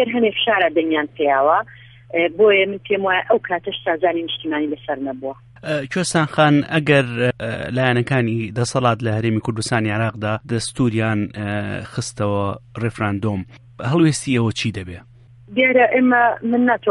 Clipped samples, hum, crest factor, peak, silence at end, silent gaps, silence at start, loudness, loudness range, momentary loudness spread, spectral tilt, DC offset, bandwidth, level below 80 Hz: under 0.1%; none; 18 dB; -2 dBFS; 0 s; none; 0 s; -19 LUFS; 4 LU; 11 LU; -5.5 dB/octave; under 0.1%; 11.5 kHz; -52 dBFS